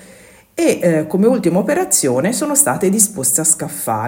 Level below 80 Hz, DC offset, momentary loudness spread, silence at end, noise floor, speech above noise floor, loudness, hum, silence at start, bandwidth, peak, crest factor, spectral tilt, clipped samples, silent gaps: -56 dBFS; under 0.1%; 4 LU; 0 s; -43 dBFS; 28 dB; -14 LUFS; none; 0.55 s; 16.5 kHz; 0 dBFS; 16 dB; -4 dB/octave; under 0.1%; none